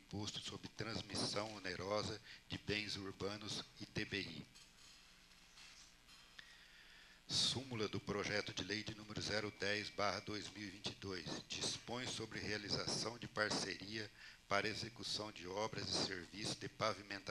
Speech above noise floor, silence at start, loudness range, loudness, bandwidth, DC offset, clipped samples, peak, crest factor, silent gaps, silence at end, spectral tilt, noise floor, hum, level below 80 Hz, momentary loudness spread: 21 dB; 0 s; 7 LU; -43 LUFS; 13 kHz; under 0.1%; under 0.1%; -20 dBFS; 24 dB; none; 0 s; -3 dB/octave; -65 dBFS; none; -70 dBFS; 20 LU